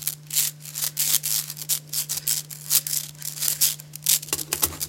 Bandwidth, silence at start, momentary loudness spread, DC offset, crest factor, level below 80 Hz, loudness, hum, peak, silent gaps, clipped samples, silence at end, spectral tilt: 17.5 kHz; 0 s; 6 LU; under 0.1%; 26 dB; -60 dBFS; -23 LUFS; none; 0 dBFS; none; under 0.1%; 0 s; 0 dB/octave